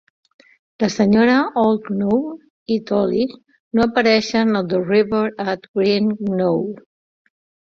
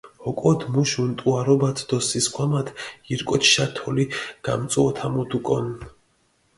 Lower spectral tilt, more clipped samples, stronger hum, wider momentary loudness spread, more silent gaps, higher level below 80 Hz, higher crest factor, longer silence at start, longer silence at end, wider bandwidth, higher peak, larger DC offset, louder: first, -6 dB/octave vs -4.5 dB/octave; neither; neither; about the same, 9 LU vs 11 LU; first, 2.50-2.66 s, 3.60-3.71 s, 5.68-5.74 s vs none; about the same, -56 dBFS vs -54 dBFS; about the same, 18 dB vs 20 dB; first, 0.8 s vs 0.05 s; first, 0.85 s vs 0.65 s; second, 7.4 kHz vs 11.5 kHz; about the same, -2 dBFS vs -4 dBFS; neither; first, -18 LUFS vs -22 LUFS